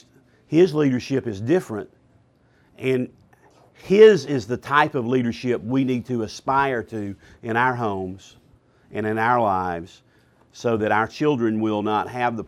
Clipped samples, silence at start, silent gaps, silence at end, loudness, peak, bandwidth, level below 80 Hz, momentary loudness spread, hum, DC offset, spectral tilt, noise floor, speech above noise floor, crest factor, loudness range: under 0.1%; 0.5 s; none; 0 s; -21 LUFS; -2 dBFS; 12.5 kHz; -58 dBFS; 14 LU; none; under 0.1%; -6.5 dB/octave; -59 dBFS; 38 dB; 20 dB; 6 LU